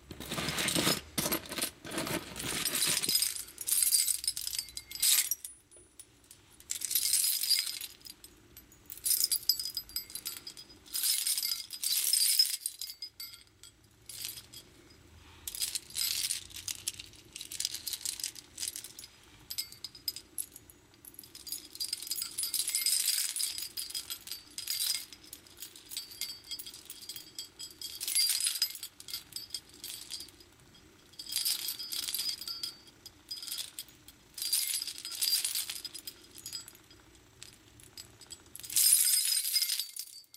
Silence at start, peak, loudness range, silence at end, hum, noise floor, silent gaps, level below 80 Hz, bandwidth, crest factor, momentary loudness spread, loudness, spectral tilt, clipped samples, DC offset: 0 s; -10 dBFS; 9 LU; 0.15 s; none; -59 dBFS; none; -66 dBFS; 16.5 kHz; 26 dB; 21 LU; -31 LUFS; 0 dB/octave; under 0.1%; under 0.1%